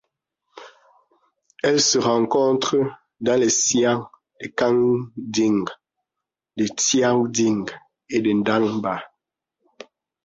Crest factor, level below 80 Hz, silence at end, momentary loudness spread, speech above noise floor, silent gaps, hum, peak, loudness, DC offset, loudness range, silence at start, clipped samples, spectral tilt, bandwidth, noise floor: 16 dB; -62 dBFS; 1.2 s; 10 LU; 65 dB; none; none; -6 dBFS; -20 LUFS; under 0.1%; 3 LU; 0.55 s; under 0.1%; -3.5 dB/octave; 8 kHz; -85 dBFS